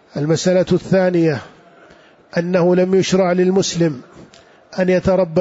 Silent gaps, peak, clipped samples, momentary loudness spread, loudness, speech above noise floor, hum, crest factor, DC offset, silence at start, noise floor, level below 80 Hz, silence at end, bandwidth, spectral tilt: none; -4 dBFS; under 0.1%; 9 LU; -16 LUFS; 31 dB; none; 12 dB; under 0.1%; 0.15 s; -47 dBFS; -46 dBFS; 0 s; 8 kHz; -6 dB/octave